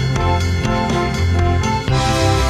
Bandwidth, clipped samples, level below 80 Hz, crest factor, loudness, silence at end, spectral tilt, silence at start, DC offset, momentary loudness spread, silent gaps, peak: 13.5 kHz; under 0.1%; -24 dBFS; 12 dB; -17 LUFS; 0 s; -5.5 dB/octave; 0 s; under 0.1%; 3 LU; none; -4 dBFS